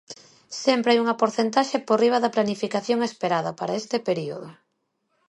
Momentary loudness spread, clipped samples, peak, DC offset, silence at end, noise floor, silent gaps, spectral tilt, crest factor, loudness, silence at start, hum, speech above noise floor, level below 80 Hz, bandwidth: 13 LU; under 0.1%; -6 dBFS; under 0.1%; 0.75 s; -74 dBFS; none; -4.5 dB/octave; 18 dB; -23 LUFS; 0.1 s; none; 51 dB; -72 dBFS; 11 kHz